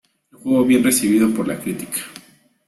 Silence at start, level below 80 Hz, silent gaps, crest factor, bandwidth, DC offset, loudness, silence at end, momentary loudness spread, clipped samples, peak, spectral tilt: 0.45 s; -58 dBFS; none; 16 dB; 14.5 kHz; under 0.1%; -18 LUFS; 0.5 s; 13 LU; under 0.1%; -4 dBFS; -4 dB/octave